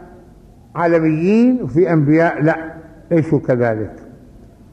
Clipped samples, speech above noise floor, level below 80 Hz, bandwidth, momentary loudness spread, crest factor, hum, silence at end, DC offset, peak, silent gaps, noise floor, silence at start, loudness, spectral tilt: under 0.1%; 29 dB; -48 dBFS; 8.2 kHz; 11 LU; 14 dB; none; 0.6 s; under 0.1%; -4 dBFS; none; -43 dBFS; 0 s; -15 LUFS; -9.5 dB/octave